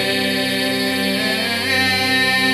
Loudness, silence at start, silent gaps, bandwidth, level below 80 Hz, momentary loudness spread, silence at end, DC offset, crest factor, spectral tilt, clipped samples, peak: -17 LUFS; 0 s; none; 16 kHz; -56 dBFS; 3 LU; 0 s; under 0.1%; 14 dB; -3 dB/octave; under 0.1%; -4 dBFS